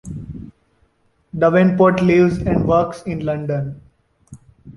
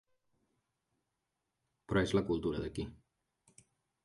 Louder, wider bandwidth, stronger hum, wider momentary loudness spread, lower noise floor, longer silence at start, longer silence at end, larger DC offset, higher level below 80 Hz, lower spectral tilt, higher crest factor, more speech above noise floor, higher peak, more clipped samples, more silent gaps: first, -16 LUFS vs -36 LUFS; about the same, 11.5 kHz vs 11.5 kHz; neither; first, 19 LU vs 12 LU; second, -61 dBFS vs -86 dBFS; second, 0.05 s vs 1.9 s; second, 0.05 s vs 1.1 s; neither; first, -40 dBFS vs -56 dBFS; first, -8.5 dB/octave vs -6.5 dB/octave; second, 16 dB vs 22 dB; second, 45 dB vs 52 dB; first, -2 dBFS vs -18 dBFS; neither; neither